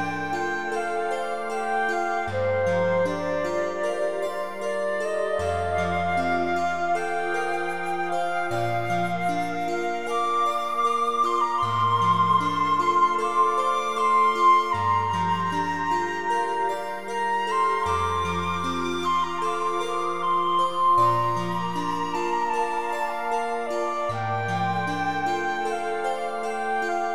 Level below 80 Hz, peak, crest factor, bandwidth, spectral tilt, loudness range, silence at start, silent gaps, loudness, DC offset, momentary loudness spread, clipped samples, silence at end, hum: -56 dBFS; -10 dBFS; 16 dB; 16 kHz; -5 dB/octave; 5 LU; 0 s; none; -24 LUFS; 1%; 7 LU; under 0.1%; 0 s; none